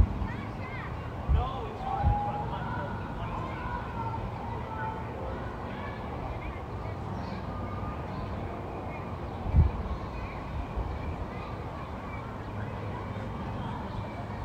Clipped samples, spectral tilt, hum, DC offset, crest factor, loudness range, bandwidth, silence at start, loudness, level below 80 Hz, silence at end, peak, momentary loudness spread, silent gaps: under 0.1%; -8 dB/octave; none; under 0.1%; 22 dB; 4 LU; 8.8 kHz; 0 s; -35 LUFS; -38 dBFS; 0 s; -12 dBFS; 9 LU; none